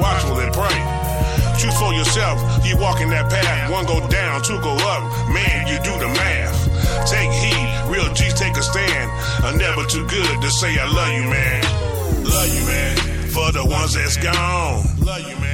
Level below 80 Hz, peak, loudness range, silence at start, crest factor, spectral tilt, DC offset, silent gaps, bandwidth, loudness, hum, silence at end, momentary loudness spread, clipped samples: -24 dBFS; -4 dBFS; 1 LU; 0 s; 14 dB; -4 dB/octave; 0.2%; none; 17 kHz; -18 LUFS; none; 0 s; 3 LU; under 0.1%